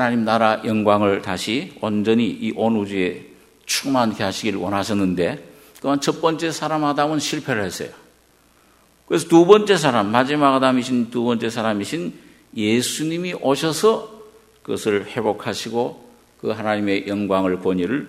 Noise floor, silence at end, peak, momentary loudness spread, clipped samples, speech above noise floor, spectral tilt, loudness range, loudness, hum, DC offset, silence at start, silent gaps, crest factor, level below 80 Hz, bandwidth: -56 dBFS; 0 s; 0 dBFS; 10 LU; under 0.1%; 36 dB; -5 dB/octave; 6 LU; -20 LUFS; none; under 0.1%; 0 s; none; 20 dB; -60 dBFS; 16 kHz